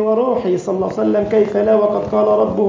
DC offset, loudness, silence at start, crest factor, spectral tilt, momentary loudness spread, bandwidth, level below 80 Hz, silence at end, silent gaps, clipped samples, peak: under 0.1%; -16 LUFS; 0 s; 14 dB; -8 dB/octave; 4 LU; 7.6 kHz; -48 dBFS; 0 s; none; under 0.1%; -2 dBFS